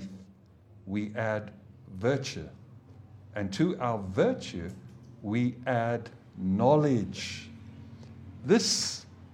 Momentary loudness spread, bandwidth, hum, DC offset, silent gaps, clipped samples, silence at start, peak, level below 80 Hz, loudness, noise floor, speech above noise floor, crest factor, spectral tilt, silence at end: 24 LU; 15.5 kHz; none; under 0.1%; none; under 0.1%; 0 s; -10 dBFS; -62 dBFS; -29 LUFS; -56 dBFS; 27 dB; 20 dB; -5 dB/octave; 0.05 s